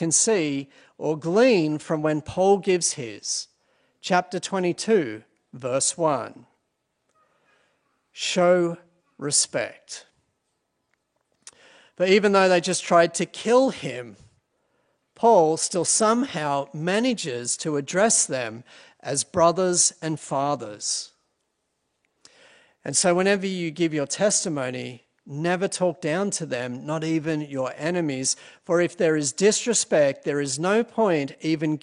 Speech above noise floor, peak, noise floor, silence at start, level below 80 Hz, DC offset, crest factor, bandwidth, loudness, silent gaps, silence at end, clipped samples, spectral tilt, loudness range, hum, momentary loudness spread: 53 dB; -4 dBFS; -76 dBFS; 0 s; -68 dBFS; under 0.1%; 20 dB; 11 kHz; -23 LUFS; none; 0.05 s; under 0.1%; -3.5 dB/octave; 5 LU; none; 13 LU